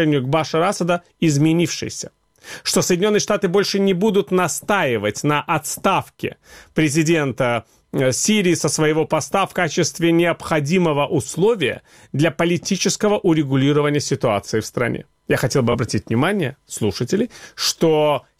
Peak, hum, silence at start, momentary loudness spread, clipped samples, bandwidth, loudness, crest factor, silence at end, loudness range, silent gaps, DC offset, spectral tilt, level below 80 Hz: -2 dBFS; none; 0 s; 7 LU; under 0.1%; 16 kHz; -19 LUFS; 16 dB; 0.2 s; 2 LU; none; 0.2%; -4.5 dB/octave; -52 dBFS